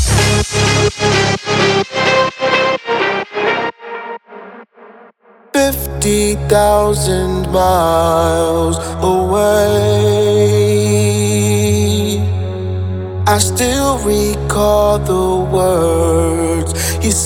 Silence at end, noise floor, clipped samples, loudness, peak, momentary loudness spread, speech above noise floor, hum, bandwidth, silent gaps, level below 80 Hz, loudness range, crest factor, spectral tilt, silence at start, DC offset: 0 s; -45 dBFS; under 0.1%; -13 LUFS; 0 dBFS; 6 LU; 32 dB; none; 18 kHz; none; -28 dBFS; 5 LU; 14 dB; -4.5 dB/octave; 0 s; under 0.1%